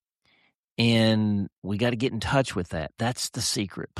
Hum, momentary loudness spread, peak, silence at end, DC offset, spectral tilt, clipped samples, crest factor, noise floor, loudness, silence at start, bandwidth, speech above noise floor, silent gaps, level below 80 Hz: none; 10 LU; -8 dBFS; 0 s; under 0.1%; -5 dB/octave; under 0.1%; 18 dB; -67 dBFS; -26 LUFS; 0.8 s; 14 kHz; 40 dB; 1.53-1.62 s; -52 dBFS